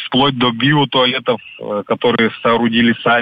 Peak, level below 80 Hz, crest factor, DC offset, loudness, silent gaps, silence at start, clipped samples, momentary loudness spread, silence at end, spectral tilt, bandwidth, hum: -4 dBFS; -52 dBFS; 12 dB; under 0.1%; -15 LUFS; none; 0 s; under 0.1%; 8 LU; 0 s; -8 dB/octave; 5 kHz; none